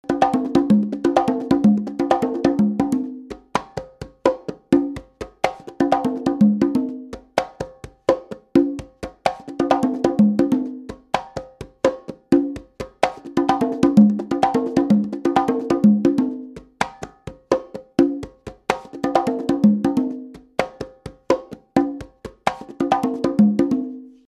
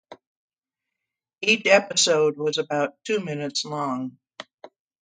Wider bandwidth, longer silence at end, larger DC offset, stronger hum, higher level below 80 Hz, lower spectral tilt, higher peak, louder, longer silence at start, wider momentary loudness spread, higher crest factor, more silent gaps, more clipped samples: first, 12 kHz vs 9.4 kHz; second, 0.2 s vs 0.35 s; neither; neither; first, -50 dBFS vs -74 dBFS; first, -7 dB/octave vs -2.5 dB/octave; about the same, 0 dBFS vs -2 dBFS; about the same, -20 LUFS vs -22 LUFS; about the same, 0.1 s vs 0.1 s; second, 17 LU vs 23 LU; about the same, 20 dB vs 22 dB; second, none vs 0.27-0.48 s, 0.58-0.62 s, 4.54-4.58 s; neither